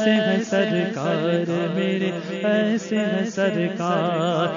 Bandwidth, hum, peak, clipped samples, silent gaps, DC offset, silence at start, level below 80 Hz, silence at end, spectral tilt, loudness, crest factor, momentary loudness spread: 7.4 kHz; none; -6 dBFS; under 0.1%; none; under 0.1%; 0 s; -70 dBFS; 0 s; -6 dB/octave; -22 LUFS; 14 dB; 3 LU